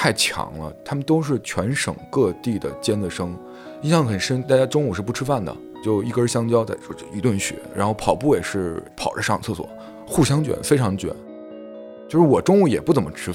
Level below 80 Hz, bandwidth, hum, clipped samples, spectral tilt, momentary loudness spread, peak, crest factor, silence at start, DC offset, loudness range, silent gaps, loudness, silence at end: -48 dBFS; 16.5 kHz; none; under 0.1%; -5.5 dB/octave; 14 LU; -2 dBFS; 20 dB; 0 s; under 0.1%; 3 LU; none; -21 LUFS; 0 s